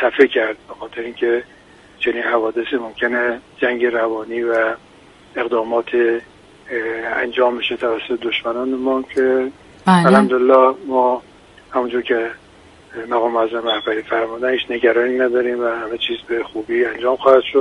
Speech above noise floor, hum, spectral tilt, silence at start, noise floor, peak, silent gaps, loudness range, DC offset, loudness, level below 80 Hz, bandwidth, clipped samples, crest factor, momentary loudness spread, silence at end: 28 dB; none; -6.5 dB/octave; 0 s; -45 dBFS; 0 dBFS; none; 5 LU; under 0.1%; -18 LUFS; -56 dBFS; 11.5 kHz; under 0.1%; 18 dB; 11 LU; 0 s